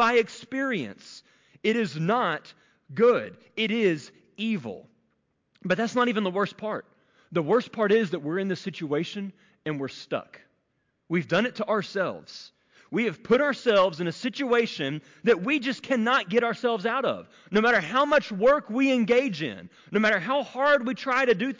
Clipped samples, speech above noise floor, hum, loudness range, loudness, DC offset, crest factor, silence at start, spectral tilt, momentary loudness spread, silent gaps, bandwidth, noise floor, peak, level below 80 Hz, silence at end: under 0.1%; 49 dB; none; 6 LU; -25 LUFS; under 0.1%; 14 dB; 0 s; -5.5 dB/octave; 12 LU; none; 7.6 kHz; -74 dBFS; -12 dBFS; -68 dBFS; 0.05 s